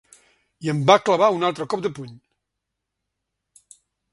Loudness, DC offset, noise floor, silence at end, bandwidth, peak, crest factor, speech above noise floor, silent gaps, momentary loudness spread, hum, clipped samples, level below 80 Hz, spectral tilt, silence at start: -20 LUFS; under 0.1%; -81 dBFS; 1.95 s; 11.5 kHz; 0 dBFS; 24 dB; 62 dB; none; 17 LU; none; under 0.1%; -66 dBFS; -5.5 dB/octave; 0.6 s